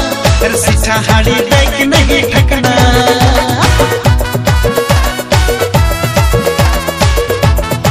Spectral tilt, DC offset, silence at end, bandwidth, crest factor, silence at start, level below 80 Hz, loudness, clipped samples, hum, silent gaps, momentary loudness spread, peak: -4.5 dB/octave; under 0.1%; 0 s; 16 kHz; 10 dB; 0 s; -16 dBFS; -10 LUFS; 0.8%; none; none; 3 LU; 0 dBFS